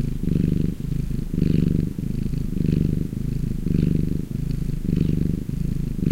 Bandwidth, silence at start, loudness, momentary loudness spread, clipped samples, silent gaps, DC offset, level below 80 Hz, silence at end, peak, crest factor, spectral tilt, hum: 16 kHz; 0 s; -24 LUFS; 6 LU; under 0.1%; none; under 0.1%; -28 dBFS; 0 s; -6 dBFS; 18 dB; -9 dB/octave; none